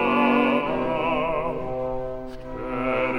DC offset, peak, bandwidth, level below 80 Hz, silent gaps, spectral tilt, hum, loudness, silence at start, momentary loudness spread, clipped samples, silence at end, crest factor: under 0.1%; -6 dBFS; 10.5 kHz; -42 dBFS; none; -7 dB/octave; none; -24 LUFS; 0 s; 14 LU; under 0.1%; 0 s; 18 dB